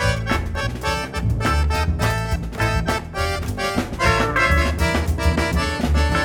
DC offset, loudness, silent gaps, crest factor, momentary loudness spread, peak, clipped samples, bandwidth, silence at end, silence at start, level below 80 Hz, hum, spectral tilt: under 0.1%; -21 LUFS; none; 16 dB; 6 LU; -4 dBFS; under 0.1%; 18 kHz; 0 s; 0 s; -26 dBFS; none; -5 dB/octave